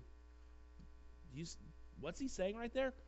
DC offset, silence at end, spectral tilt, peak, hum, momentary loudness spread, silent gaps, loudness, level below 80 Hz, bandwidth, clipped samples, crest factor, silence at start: under 0.1%; 0 s; -5 dB/octave; -28 dBFS; none; 22 LU; none; -45 LUFS; -58 dBFS; 8.2 kHz; under 0.1%; 18 dB; 0 s